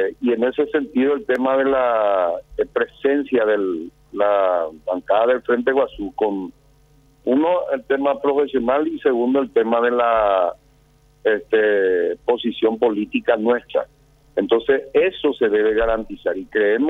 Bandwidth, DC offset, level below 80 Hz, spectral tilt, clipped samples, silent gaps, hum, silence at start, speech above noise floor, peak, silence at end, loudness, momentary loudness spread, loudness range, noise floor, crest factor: 4 kHz; under 0.1%; -48 dBFS; -7 dB/octave; under 0.1%; none; none; 0 s; 36 dB; -4 dBFS; 0 s; -19 LUFS; 7 LU; 2 LU; -55 dBFS; 16 dB